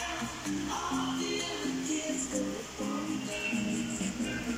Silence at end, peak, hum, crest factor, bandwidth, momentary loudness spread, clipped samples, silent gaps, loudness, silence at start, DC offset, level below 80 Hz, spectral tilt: 0 s; -18 dBFS; none; 14 dB; 16 kHz; 3 LU; under 0.1%; none; -33 LUFS; 0 s; under 0.1%; -56 dBFS; -3.5 dB/octave